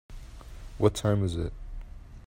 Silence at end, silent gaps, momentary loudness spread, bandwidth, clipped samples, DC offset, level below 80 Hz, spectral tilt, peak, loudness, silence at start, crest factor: 0 s; none; 22 LU; 16 kHz; under 0.1%; under 0.1%; -42 dBFS; -6.5 dB/octave; -8 dBFS; -28 LUFS; 0.1 s; 22 dB